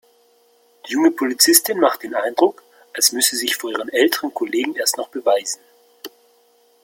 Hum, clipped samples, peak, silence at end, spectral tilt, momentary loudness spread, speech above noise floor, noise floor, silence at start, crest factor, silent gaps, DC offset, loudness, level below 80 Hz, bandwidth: none; under 0.1%; 0 dBFS; 0.75 s; -0.5 dB/octave; 17 LU; 38 dB; -57 dBFS; 0.85 s; 20 dB; none; under 0.1%; -18 LUFS; -70 dBFS; 17 kHz